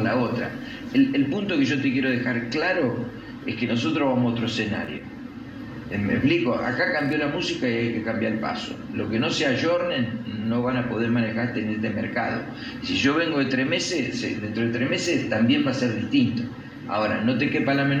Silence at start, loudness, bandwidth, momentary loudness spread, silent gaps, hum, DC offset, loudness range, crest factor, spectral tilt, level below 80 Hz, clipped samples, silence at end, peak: 0 s; -24 LUFS; 9.8 kHz; 10 LU; none; none; under 0.1%; 2 LU; 16 dB; -5.5 dB/octave; -54 dBFS; under 0.1%; 0 s; -8 dBFS